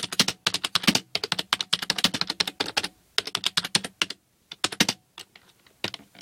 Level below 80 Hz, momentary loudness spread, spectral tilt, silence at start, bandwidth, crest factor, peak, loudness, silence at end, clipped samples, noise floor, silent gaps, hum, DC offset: -66 dBFS; 12 LU; -1.5 dB/octave; 0 s; 17 kHz; 26 dB; -2 dBFS; -25 LUFS; 0 s; under 0.1%; -56 dBFS; none; none; under 0.1%